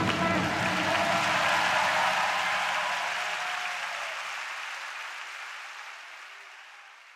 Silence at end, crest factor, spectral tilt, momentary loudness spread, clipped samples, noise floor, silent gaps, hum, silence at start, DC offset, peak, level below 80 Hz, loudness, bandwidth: 0 s; 18 dB; -3 dB/octave; 19 LU; under 0.1%; -50 dBFS; none; none; 0 s; under 0.1%; -12 dBFS; -64 dBFS; -28 LUFS; 16 kHz